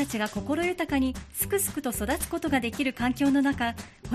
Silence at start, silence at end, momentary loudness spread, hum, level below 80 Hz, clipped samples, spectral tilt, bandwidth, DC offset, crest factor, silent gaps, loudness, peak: 0 s; 0 s; 6 LU; none; -46 dBFS; under 0.1%; -4 dB/octave; 15.5 kHz; under 0.1%; 16 dB; none; -27 LUFS; -12 dBFS